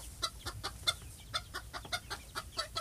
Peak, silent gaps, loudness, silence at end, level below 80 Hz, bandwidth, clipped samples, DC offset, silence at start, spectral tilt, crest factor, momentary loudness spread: -18 dBFS; none; -39 LUFS; 0 s; -54 dBFS; 15.5 kHz; under 0.1%; under 0.1%; 0 s; -1.5 dB/octave; 24 dB; 9 LU